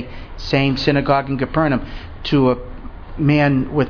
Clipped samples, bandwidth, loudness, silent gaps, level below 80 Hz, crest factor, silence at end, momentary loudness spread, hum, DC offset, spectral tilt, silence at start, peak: under 0.1%; 5.4 kHz; -18 LUFS; none; -34 dBFS; 16 dB; 0 s; 18 LU; none; under 0.1%; -8 dB/octave; 0 s; -2 dBFS